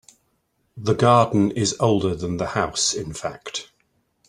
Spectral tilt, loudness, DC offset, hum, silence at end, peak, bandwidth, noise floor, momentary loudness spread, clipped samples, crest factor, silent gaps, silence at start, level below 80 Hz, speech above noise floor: -4.5 dB/octave; -21 LUFS; under 0.1%; none; 0.65 s; -2 dBFS; 12 kHz; -69 dBFS; 15 LU; under 0.1%; 20 dB; none; 0.75 s; -52 dBFS; 48 dB